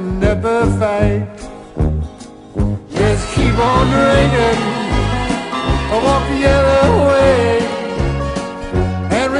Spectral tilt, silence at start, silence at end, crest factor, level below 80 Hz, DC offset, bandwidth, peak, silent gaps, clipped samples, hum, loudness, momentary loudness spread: -6 dB/octave; 0 s; 0 s; 14 dB; -24 dBFS; under 0.1%; 11 kHz; 0 dBFS; none; under 0.1%; none; -15 LUFS; 10 LU